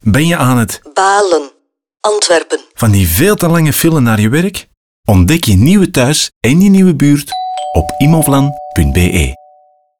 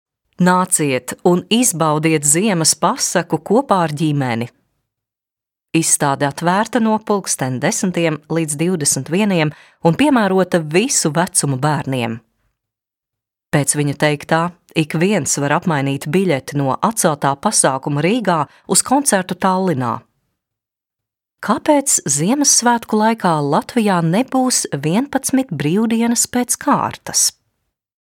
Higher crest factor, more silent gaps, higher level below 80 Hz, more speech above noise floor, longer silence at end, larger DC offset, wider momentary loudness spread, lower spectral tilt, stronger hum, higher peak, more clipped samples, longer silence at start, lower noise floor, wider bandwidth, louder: second, 10 dB vs 16 dB; first, 4.77-5.03 s, 6.36-6.41 s vs none; first, -28 dBFS vs -60 dBFS; second, 39 dB vs 71 dB; about the same, 0.65 s vs 0.7 s; first, 0.9% vs under 0.1%; about the same, 8 LU vs 6 LU; first, -5.5 dB/octave vs -4 dB/octave; neither; about the same, 0 dBFS vs 0 dBFS; neither; second, 0.05 s vs 0.4 s; second, -48 dBFS vs -87 dBFS; first, over 20 kHz vs 17.5 kHz; first, -10 LUFS vs -16 LUFS